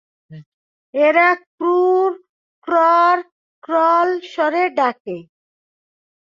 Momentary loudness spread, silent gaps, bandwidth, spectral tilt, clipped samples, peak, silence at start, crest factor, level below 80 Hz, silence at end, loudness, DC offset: 17 LU; 0.46-0.93 s, 1.47-1.58 s, 2.29-2.62 s, 3.32-3.62 s, 5.00-5.05 s; 7.2 kHz; -6 dB/octave; under 0.1%; -2 dBFS; 0.3 s; 16 dB; -72 dBFS; 1.05 s; -16 LUFS; under 0.1%